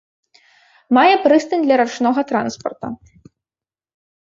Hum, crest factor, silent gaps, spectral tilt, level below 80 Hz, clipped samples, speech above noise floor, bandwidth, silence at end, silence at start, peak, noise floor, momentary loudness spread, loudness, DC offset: none; 16 dB; none; -4.5 dB/octave; -62 dBFS; under 0.1%; over 74 dB; 7.8 kHz; 1.4 s; 0.9 s; -2 dBFS; under -90 dBFS; 17 LU; -16 LUFS; under 0.1%